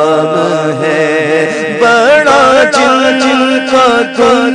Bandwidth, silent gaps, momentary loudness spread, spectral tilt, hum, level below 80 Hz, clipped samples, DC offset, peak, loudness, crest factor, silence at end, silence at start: 10.5 kHz; none; 6 LU; -4 dB/octave; none; -46 dBFS; 0.5%; under 0.1%; 0 dBFS; -8 LUFS; 8 dB; 0 s; 0 s